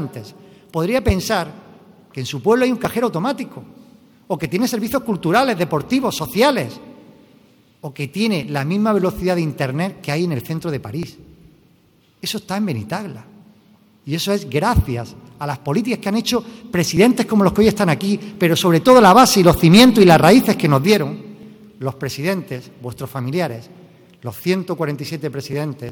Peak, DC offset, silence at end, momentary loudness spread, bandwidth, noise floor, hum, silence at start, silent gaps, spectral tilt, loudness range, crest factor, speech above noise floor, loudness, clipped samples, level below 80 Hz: 0 dBFS; under 0.1%; 0 s; 19 LU; 19.5 kHz; -55 dBFS; none; 0 s; none; -5.5 dB/octave; 14 LU; 18 dB; 38 dB; -17 LUFS; under 0.1%; -40 dBFS